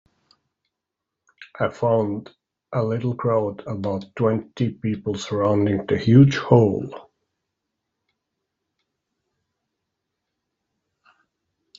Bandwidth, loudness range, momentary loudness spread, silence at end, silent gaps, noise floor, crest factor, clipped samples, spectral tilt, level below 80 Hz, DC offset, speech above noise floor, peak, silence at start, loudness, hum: 7.6 kHz; 6 LU; 14 LU; 4.75 s; none; -84 dBFS; 22 dB; under 0.1%; -7.5 dB/octave; -58 dBFS; under 0.1%; 64 dB; -2 dBFS; 1.4 s; -21 LUFS; none